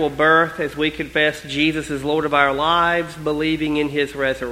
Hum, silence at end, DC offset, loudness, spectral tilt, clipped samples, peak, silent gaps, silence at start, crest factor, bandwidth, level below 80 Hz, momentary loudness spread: none; 0 s; under 0.1%; -19 LUFS; -5 dB/octave; under 0.1%; 0 dBFS; none; 0 s; 20 dB; 15.5 kHz; -44 dBFS; 7 LU